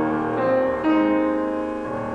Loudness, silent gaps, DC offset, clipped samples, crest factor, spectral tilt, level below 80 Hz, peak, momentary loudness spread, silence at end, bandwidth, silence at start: -22 LUFS; none; under 0.1%; under 0.1%; 12 dB; -8 dB/octave; -50 dBFS; -8 dBFS; 8 LU; 0 s; 5.6 kHz; 0 s